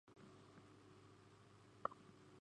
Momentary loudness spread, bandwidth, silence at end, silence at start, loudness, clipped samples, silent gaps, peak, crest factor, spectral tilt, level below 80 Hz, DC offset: 16 LU; 10.5 kHz; 0 s; 0.05 s; -57 LUFS; under 0.1%; none; -24 dBFS; 34 dB; -5.5 dB/octave; -84 dBFS; under 0.1%